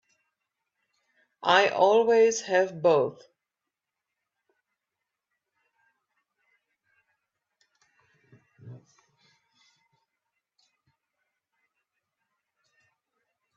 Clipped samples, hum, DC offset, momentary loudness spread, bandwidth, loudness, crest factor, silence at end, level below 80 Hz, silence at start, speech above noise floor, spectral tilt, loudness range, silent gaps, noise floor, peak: under 0.1%; none; under 0.1%; 6 LU; 7.6 kHz; -23 LUFS; 24 dB; 4.8 s; -80 dBFS; 1.45 s; 65 dB; -3.5 dB/octave; 8 LU; none; -87 dBFS; -6 dBFS